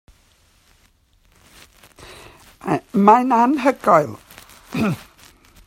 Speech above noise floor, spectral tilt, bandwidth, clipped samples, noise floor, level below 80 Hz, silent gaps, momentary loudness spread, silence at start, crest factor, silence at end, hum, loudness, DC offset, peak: 41 dB; -7 dB/octave; 16 kHz; under 0.1%; -58 dBFS; -56 dBFS; none; 22 LU; 2 s; 20 dB; 0.7 s; none; -17 LUFS; under 0.1%; 0 dBFS